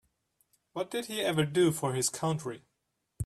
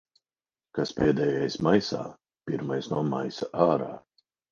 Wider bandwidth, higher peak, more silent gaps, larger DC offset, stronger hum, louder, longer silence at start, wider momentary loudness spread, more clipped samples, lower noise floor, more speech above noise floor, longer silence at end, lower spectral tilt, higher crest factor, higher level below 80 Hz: first, 14 kHz vs 7.4 kHz; second, -16 dBFS vs -6 dBFS; neither; neither; neither; second, -30 LUFS vs -27 LUFS; about the same, 0.75 s vs 0.75 s; about the same, 15 LU vs 14 LU; neither; second, -81 dBFS vs under -90 dBFS; second, 51 dB vs over 64 dB; second, 0 s vs 0.55 s; second, -4.5 dB/octave vs -6.5 dB/octave; about the same, 18 dB vs 22 dB; about the same, -62 dBFS vs -58 dBFS